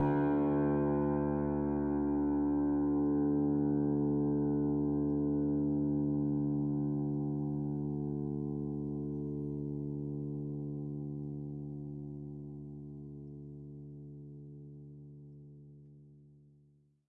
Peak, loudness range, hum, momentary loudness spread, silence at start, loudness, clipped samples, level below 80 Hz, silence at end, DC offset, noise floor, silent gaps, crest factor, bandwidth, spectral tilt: -20 dBFS; 18 LU; none; 18 LU; 0 s; -34 LUFS; under 0.1%; -56 dBFS; 0.9 s; under 0.1%; -67 dBFS; none; 14 dB; 2.6 kHz; -12.5 dB/octave